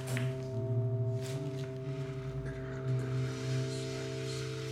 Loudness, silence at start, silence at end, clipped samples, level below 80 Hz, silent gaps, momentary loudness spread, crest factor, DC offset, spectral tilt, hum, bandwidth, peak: -37 LUFS; 0 s; 0 s; under 0.1%; -56 dBFS; none; 6 LU; 16 dB; under 0.1%; -6.5 dB/octave; 50 Hz at -55 dBFS; 13.5 kHz; -18 dBFS